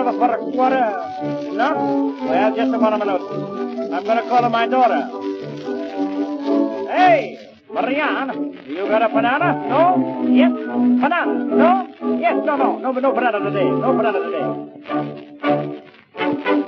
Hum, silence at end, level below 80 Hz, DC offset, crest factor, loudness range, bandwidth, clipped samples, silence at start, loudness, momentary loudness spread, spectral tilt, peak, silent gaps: none; 0 s; -72 dBFS; under 0.1%; 16 dB; 3 LU; 6.4 kHz; under 0.1%; 0 s; -19 LUFS; 11 LU; -7.5 dB/octave; -2 dBFS; none